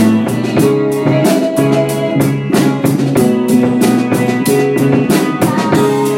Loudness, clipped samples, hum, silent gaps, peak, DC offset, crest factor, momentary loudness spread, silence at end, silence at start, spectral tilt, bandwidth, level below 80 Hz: -12 LUFS; under 0.1%; none; none; 0 dBFS; under 0.1%; 10 dB; 2 LU; 0 s; 0 s; -6 dB/octave; 17 kHz; -50 dBFS